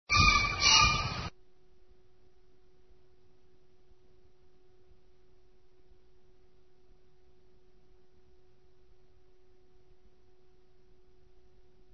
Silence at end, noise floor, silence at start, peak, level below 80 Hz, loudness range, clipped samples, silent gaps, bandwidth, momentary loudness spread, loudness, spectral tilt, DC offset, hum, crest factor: 10.65 s; -66 dBFS; 0.1 s; -10 dBFS; -48 dBFS; 20 LU; under 0.1%; none; 6.4 kHz; 18 LU; -24 LUFS; -0.5 dB/octave; 0.2%; none; 26 dB